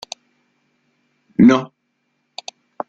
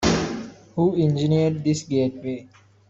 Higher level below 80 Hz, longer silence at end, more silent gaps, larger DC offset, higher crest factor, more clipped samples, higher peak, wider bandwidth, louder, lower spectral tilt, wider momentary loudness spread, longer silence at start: second, -58 dBFS vs -46 dBFS; first, 1.25 s vs 0.45 s; neither; neither; about the same, 18 dB vs 16 dB; neither; first, -2 dBFS vs -6 dBFS; about the same, 7.8 kHz vs 7.8 kHz; first, -15 LUFS vs -23 LUFS; about the same, -6.5 dB/octave vs -6 dB/octave; first, 25 LU vs 13 LU; first, 1.4 s vs 0 s